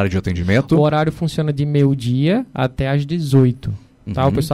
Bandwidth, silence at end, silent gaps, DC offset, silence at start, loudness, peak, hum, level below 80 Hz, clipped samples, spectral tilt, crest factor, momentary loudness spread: 13 kHz; 0 s; none; under 0.1%; 0 s; -17 LUFS; -4 dBFS; none; -38 dBFS; under 0.1%; -7.5 dB/octave; 12 dB; 7 LU